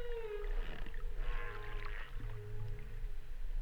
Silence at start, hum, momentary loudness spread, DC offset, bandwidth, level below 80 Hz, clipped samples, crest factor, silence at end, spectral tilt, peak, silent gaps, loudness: 0 s; none; 5 LU; under 0.1%; 5.2 kHz; -40 dBFS; under 0.1%; 12 dB; 0 s; -6 dB/octave; -26 dBFS; none; -47 LUFS